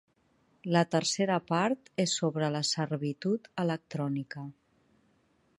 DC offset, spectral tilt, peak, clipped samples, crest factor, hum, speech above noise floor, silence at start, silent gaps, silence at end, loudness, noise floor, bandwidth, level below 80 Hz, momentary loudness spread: under 0.1%; -4.5 dB/octave; -10 dBFS; under 0.1%; 22 dB; none; 39 dB; 0.65 s; none; 1.1 s; -30 LUFS; -69 dBFS; 11.5 kHz; -74 dBFS; 8 LU